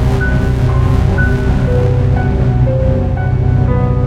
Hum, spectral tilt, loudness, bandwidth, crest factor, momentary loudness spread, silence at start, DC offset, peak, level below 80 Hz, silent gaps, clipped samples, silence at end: none; -8.5 dB/octave; -13 LUFS; 8 kHz; 10 dB; 2 LU; 0 s; under 0.1%; 0 dBFS; -18 dBFS; none; under 0.1%; 0 s